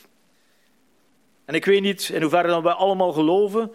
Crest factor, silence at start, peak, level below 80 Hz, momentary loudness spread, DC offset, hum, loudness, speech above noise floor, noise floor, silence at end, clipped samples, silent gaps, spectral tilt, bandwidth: 18 dB; 1.5 s; -4 dBFS; -74 dBFS; 5 LU; under 0.1%; none; -20 LUFS; 43 dB; -63 dBFS; 0 s; under 0.1%; none; -5 dB/octave; 15.5 kHz